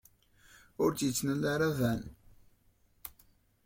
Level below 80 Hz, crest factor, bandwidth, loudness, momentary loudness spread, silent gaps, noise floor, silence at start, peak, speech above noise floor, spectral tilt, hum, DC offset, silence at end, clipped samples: -60 dBFS; 18 dB; 16.5 kHz; -32 LUFS; 19 LU; none; -68 dBFS; 0.8 s; -16 dBFS; 37 dB; -5 dB/octave; none; under 0.1%; 0.55 s; under 0.1%